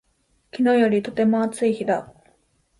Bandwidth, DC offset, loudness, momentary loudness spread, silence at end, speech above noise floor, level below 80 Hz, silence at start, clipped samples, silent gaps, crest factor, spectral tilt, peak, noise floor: 11.5 kHz; under 0.1%; -21 LUFS; 8 LU; 0.75 s; 46 dB; -62 dBFS; 0.55 s; under 0.1%; none; 14 dB; -6 dB/octave; -8 dBFS; -66 dBFS